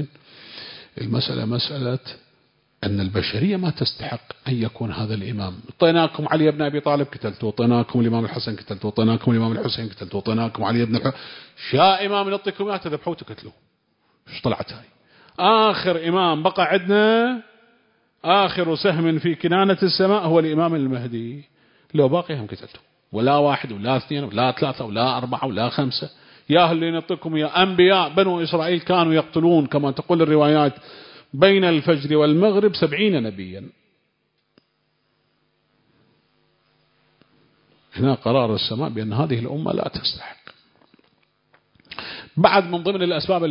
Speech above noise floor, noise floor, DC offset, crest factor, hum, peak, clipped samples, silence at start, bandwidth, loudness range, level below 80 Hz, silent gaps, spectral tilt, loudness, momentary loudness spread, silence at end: 50 dB; -70 dBFS; under 0.1%; 22 dB; none; 0 dBFS; under 0.1%; 0 s; 5.4 kHz; 7 LU; -54 dBFS; none; -11 dB/octave; -20 LUFS; 16 LU; 0 s